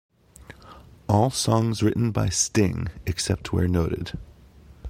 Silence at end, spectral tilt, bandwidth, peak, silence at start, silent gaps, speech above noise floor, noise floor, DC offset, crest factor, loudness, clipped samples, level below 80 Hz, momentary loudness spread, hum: 0 s; -5 dB/octave; 16 kHz; -4 dBFS; 0.4 s; none; 26 dB; -50 dBFS; under 0.1%; 20 dB; -24 LUFS; under 0.1%; -42 dBFS; 10 LU; none